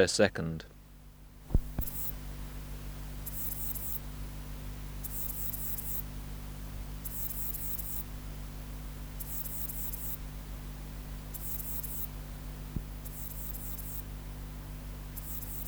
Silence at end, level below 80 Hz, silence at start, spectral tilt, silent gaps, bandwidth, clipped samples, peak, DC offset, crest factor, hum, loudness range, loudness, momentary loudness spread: 0 s; -42 dBFS; 0 s; -4.5 dB/octave; none; over 20 kHz; under 0.1%; -8 dBFS; under 0.1%; 28 dB; 50 Hz at -45 dBFS; 3 LU; -37 LUFS; 11 LU